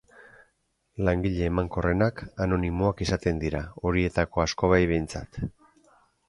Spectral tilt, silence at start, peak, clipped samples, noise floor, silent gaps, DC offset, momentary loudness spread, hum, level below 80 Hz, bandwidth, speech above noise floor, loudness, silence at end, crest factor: -6.5 dB/octave; 0.2 s; -6 dBFS; under 0.1%; -72 dBFS; none; under 0.1%; 12 LU; none; -40 dBFS; 11.5 kHz; 47 dB; -27 LUFS; 0.8 s; 20 dB